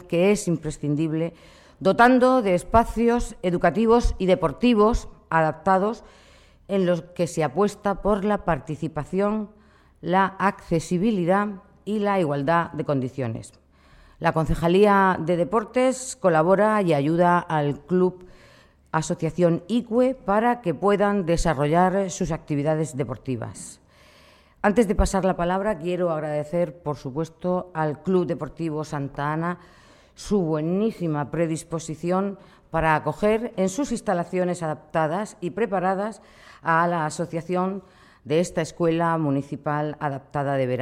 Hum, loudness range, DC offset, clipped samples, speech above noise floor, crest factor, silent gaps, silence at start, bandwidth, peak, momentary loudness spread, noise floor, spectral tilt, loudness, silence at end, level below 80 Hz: none; 6 LU; under 0.1%; under 0.1%; 31 dB; 20 dB; none; 0 s; 13.5 kHz; -4 dBFS; 10 LU; -54 dBFS; -6.5 dB/octave; -23 LUFS; 0 s; -40 dBFS